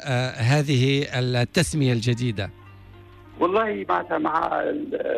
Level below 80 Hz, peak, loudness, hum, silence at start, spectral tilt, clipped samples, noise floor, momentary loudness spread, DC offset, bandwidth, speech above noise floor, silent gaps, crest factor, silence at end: -50 dBFS; -10 dBFS; -23 LUFS; none; 0 s; -5.5 dB/octave; under 0.1%; -46 dBFS; 6 LU; under 0.1%; 13.5 kHz; 23 dB; none; 14 dB; 0 s